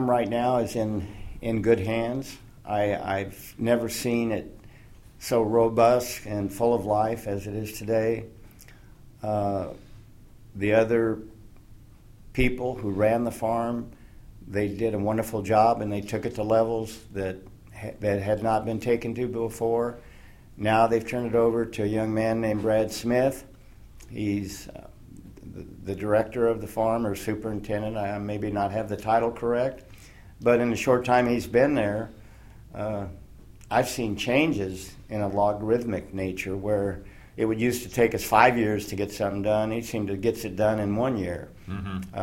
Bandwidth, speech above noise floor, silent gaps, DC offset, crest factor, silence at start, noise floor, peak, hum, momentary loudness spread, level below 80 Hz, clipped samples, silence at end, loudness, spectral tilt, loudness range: 16.5 kHz; 24 dB; none; under 0.1%; 24 dB; 0 s; -49 dBFS; -2 dBFS; none; 14 LU; -48 dBFS; under 0.1%; 0 s; -26 LUFS; -6 dB/octave; 4 LU